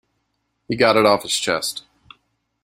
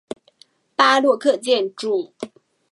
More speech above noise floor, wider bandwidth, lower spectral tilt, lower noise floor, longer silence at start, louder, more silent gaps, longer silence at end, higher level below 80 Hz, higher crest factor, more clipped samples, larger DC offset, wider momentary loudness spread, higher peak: first, 54 dB vs 37 dB; first, 16 kHz vs 11.5 kHz; about the same, -3 dB/octave vs -2.5 dB/octave; first, -72 dBFS vs -56 dBFS; about the same, 0.7 s vs 0.8 s; about the same, -18 LUFS vs -19 LUFS; neither; first, 0.85 s vs 0.45 s; first, -58 dBFS vs -76 dBFS; about the same, 20 dB vs 20 dB; neither; neither; second, 14 LU vs 21 LU; about the same, -2 dBFS vs 0 dBFS